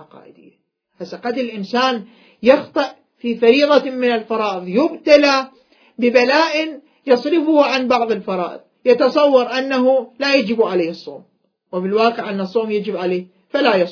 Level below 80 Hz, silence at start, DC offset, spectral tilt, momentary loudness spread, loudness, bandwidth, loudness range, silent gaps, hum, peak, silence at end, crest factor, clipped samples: -66 dBFS; 0 s; under 0.1%; -5 dB/octave; 12 LU; -17 LUFS; 5.4 kHz; 4 LU; none; none; 0 dBFS; 0 s; 18 dB; under 0.1%